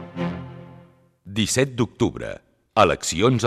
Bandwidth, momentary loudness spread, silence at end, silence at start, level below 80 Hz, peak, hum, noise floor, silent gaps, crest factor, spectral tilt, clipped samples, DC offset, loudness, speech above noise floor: 14.5 kHz; 18 LU; 0 s; 0 s; -50 dBFS; -4 dBFS; none; -52 dBFS; none; 20 dB; -4.5 dB/octave; under 0.1%; under 0.1%; -22 LUFS; 31 dB